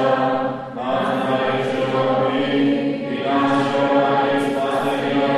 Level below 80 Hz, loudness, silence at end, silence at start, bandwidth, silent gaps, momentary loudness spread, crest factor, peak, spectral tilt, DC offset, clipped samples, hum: -58 dBFS; -19 LUFS; 0 s; 0 s; 12.5 kHz; none; 6 LU; 14 dB; -4 dBFS; -6.5 dB/octave; under 0.1%; under 0.1%; none